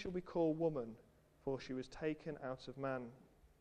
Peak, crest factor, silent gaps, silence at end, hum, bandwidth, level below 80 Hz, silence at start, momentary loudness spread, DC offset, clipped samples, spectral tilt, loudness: -26 dBFS; 18 dB; none; 0.15 s; none; 9.6 kHz; -66 dBFS; 0 s; 12 LU; under 0.1%; under 0.1%; -7.5 dB/octave; -43 LUFS